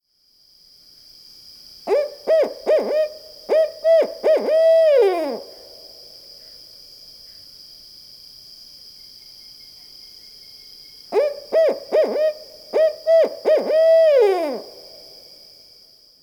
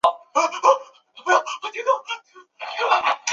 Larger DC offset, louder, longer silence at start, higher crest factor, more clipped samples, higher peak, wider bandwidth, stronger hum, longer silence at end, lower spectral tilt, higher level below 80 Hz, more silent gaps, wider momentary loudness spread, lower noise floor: neither; first, -18 LUFS vs -21 LUFS; first, 1.85 s vs 0.05 s; second, 14 dB vs 20 dB; neither; second, -6 dBFS vs -2 dBFS; first, 19.5 kHz vs 11 kHz; neither; first, 1.4 s vs 0 s; first, -3.5 dB/octave vs 0 dB/octave; first, -66 dBFS vs -72 dBFS; neither; first, 25 LU vs 13 LU; first, -58 dBFS vs -42 dBFS